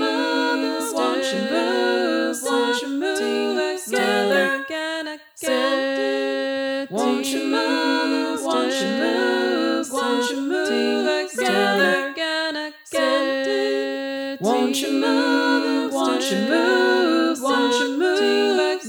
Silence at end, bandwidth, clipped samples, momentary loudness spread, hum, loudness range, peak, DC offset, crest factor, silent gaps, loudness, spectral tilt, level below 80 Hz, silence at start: 0 s; over 20 kHz; under 0.1%; 5 LU; none; 3 LU; -6 dBFS; under 0.1%; 16 dB; none; -21 LUFS; -3 dB/octave; -80 dBFS; 0 s